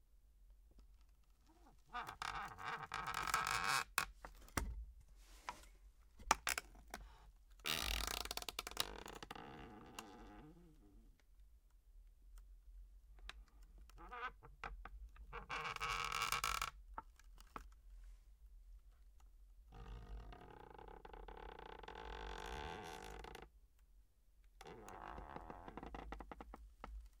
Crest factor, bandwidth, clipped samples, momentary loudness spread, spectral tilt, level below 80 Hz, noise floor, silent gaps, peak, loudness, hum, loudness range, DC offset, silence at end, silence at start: 36 dB; 18 kHz; under 0.1%; 25 LU; -2 dB/octave; -58 dBFS; -69 dBFS; none; -12 dBFS; -46 LUFS; none; 18 LU; under 0.1%; 0 s; 0.1 s